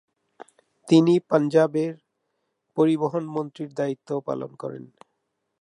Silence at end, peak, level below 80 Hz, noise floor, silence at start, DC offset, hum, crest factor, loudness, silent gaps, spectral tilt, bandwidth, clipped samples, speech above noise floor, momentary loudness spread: 0.8 s; -4 dBFS; -74 dBFS; -77 dBFS; 0.85 s; under 0.1%; none; 20 dB; -23 LUFS; none; -7.5 dB/octave; 10.5 kHz; under 0.1%; 55 dB; 16 LU